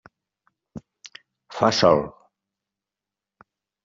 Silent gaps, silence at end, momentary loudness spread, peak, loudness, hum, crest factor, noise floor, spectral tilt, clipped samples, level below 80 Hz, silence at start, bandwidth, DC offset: none; 1.75 s; 26 LU; -2 dBFS; -20 LUFS; none; 24 dB; -88 dBFS; -3.5 dB/octave; under 0.1%; -60 dBFS; 0.75 s; 7.6 kHz; under 0.1%